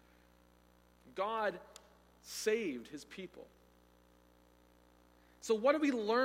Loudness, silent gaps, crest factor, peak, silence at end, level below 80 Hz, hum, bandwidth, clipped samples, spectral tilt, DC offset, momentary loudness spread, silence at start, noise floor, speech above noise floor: -36 LUFS; none; 24 dB; -16 dBFS; 0 s; -72 dBFS; 60 Hz at -70 dBFS; 16.5 kHz; under 0.1%; -3.5 dB/octave; under 0.1%; 25 LU; 1.05 s; -67 dBFS; 31 dB